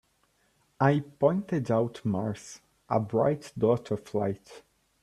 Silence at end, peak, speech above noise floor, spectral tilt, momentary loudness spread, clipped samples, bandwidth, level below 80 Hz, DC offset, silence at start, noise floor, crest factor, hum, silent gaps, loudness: 0.45 s; -10 dBFS; 42 dB; -7.5 dB/octave; 11 LU; under 0.1%; 12.5 kHz; -64 dBFS; under 0.1%; 0.8 s; -70 dBFS; 20 dB; none; none; -28 LUFS